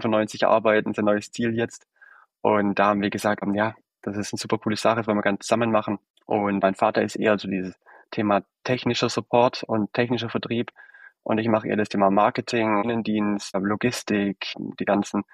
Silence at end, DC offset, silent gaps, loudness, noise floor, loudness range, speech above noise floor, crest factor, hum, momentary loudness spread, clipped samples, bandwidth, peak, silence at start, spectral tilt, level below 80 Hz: 0.1 s; under 0.1%; 6.10-6.14 s; -24 LUFS; -54 dBFS; 2 LU; 31 dB; 18 dB; none; 9 LU; under 0.1%; 14 kHz; -4 dBFS; 0 s; -5.5 dB/octave; -64 dBFS